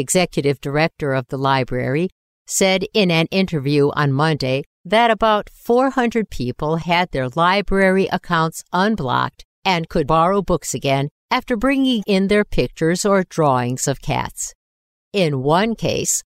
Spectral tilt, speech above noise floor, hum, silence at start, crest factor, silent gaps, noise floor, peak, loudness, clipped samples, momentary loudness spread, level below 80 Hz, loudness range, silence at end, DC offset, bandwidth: -4.5 dB/octave; over 72 dB; none; 0 s; 14 dB; 2.12-2.45 s, 4.66-4.84 s, 9.45-9.62 s, 11.11-11.29 s, 14.55-15.11 s; under -90 dBFS; -4 dBFS; -18 LUFS; under 0.1%; 6 LU; -38 dBFS; 2 LU; 0.1 s; under 0.1%; 16 kHz